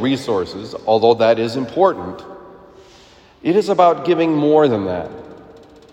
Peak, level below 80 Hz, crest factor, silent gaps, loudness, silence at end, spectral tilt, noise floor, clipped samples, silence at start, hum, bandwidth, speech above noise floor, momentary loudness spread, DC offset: 0 dBFS; -56 dBFS; 16 dB; none; -16 LUFS; 0.4 s; -6.5 dB/octave; -46 dBFS; under 0.1%; 0 s; none; 10.5 kHz; 30 dB; 17 LU; under 0.1%